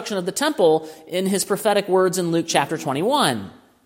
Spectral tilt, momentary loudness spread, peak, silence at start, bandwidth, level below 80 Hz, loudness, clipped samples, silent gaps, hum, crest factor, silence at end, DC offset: -4 dB/octave; 7 LU; -2 dBFS; 0 s; 16.5 kHz; -66 dBFS; -20 LUFS; under 0.1%; none; none; 18 dB; 0.35 s; under 0.1%